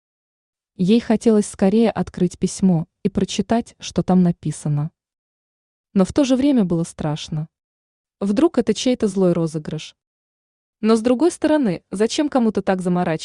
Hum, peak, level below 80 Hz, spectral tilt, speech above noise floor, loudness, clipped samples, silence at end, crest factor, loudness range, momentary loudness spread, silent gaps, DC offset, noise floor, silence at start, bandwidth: none; -4 dBFS; -50 dBFS; -6.5 dB/octave; over 72 dB; -19 LUFS; under 0.1%; 0 s; 16 dB; 3 LU; 9 LU; 5.18-5.84 s, 7.64-8.04 s, 10.07-10.73 s; under 0.1%; under -90 dBFS; 0.8 s; 11 kHz